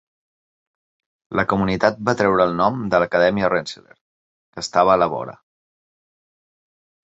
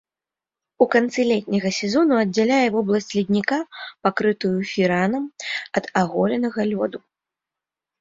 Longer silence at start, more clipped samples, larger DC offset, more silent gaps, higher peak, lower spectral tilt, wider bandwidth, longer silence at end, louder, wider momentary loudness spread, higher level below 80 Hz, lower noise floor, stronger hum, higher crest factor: first, 1.3 s vs 0.8 s; neither; neither; first, 4.01-4.53 s vs none; about the same, 0 dBFS vs -2 dBFS; about the same, -5.5 dB/octave vs -5.5 dB/octave; about the same, 8.2 kHz vs 7.8 kHz; first, 1.7 s vs 1.05 s; about the same, -19 LUFS vs -21 LUFS; first, 14 LU vs 8 LU; first, -50 dBFS vs -62 dBFS; about the same, under -90 dBFS vs -89 dBFS; neither; about the same, 20 dB vs 20 dB